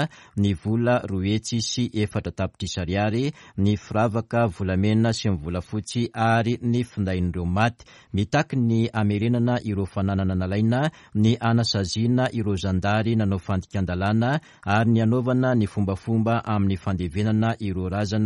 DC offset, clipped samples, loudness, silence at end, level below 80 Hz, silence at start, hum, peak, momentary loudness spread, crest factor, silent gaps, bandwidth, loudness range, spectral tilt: under 0.1%; under 0.1%; -24 LUFS; 0 s; -48 dBFS; 0 s; none; -6 dBFS; 6 LU; 16 dB; none; 11.5 kHz; 2 LU; -6.5 dB/octave